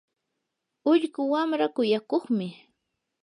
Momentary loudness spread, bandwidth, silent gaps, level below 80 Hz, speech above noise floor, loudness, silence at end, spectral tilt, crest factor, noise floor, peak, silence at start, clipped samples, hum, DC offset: 6 LU; 10.5 kHz; none; -82 dBFS; 57 dB; -26 LUFS; 0.7 s; -6.5 dB/octave; 16 dB; -82 dBFS; -12 dBFS; 0.85 s; under 0.1%; none; under 0.1%